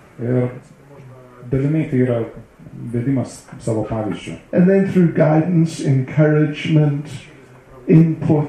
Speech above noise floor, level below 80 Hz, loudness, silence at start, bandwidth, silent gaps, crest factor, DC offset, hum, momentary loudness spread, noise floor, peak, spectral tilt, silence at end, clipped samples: 26 dB; -48 dBFS; -17 LUFS; 0.2 s; 10 kHz; none; 16 dB; under 0.1%; none; 15 LU; -42 dBFS; -2 dBFS; -8.5 dB/octave; 0 s; under 0.1%